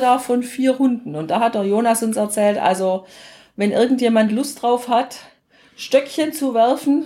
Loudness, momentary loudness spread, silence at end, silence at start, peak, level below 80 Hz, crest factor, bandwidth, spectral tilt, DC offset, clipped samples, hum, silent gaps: -18 LUFS; 7 LU; 0 s; 0 s; -2 dBFS; -66 dBFS; 16 dB; 16.5 kHz; -4.5 dB/octave; under 0.1%; under 0.1%; none; none